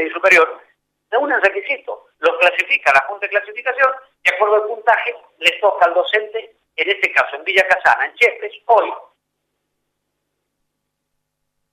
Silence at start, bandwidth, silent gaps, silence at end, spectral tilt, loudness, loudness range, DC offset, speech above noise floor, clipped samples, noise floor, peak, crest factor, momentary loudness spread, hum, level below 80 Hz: 0 s; 15.5 kHz; none; 2.7 s; -1.5 dB/octave; -16 LUFS; 4 LU; under 0.1%; 59 dB; under 0.1%; -75 dBFS; -2 dBFS; 16 dB; 10 LU; 50 Hz at -80 dBFS; -66 dBFS